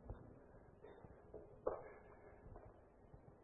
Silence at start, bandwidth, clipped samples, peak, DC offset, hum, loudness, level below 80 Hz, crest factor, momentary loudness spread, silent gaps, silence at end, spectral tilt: 0 s; 3.7 kHz; under 0.1%; -26 dBFS; under 0.1%; none; -56 LUFS; -66 dBFS; 28 dB; 17 LU; none; 0 s; -4.5 dB/octave